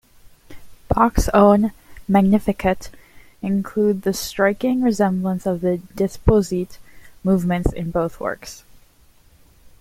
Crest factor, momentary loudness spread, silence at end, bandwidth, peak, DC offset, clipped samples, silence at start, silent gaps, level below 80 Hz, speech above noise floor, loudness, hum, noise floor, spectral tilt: 18 dB; 12 LU; 1.25 s; 16 kHz; -2 dBFS; under 0.1%; under 0.1%; 0.5 s; none; -34 dBFS; 34 dB; -19 LUFS; none; -52 dBFS; -6.5 dB/octave